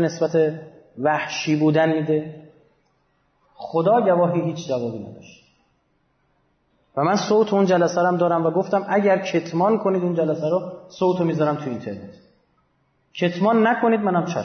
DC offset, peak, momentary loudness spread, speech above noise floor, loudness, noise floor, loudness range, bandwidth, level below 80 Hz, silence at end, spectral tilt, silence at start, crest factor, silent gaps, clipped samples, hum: under 0.1%; -8 dBFS; 13 LU; 46 dB; -21 LUFS; -66 dBFS; 5 LU; 6.6 kHz; -68 dBFS; 0 s; -6.5 dB/octave; 0 s; 14 dB; none; under 0.1%; none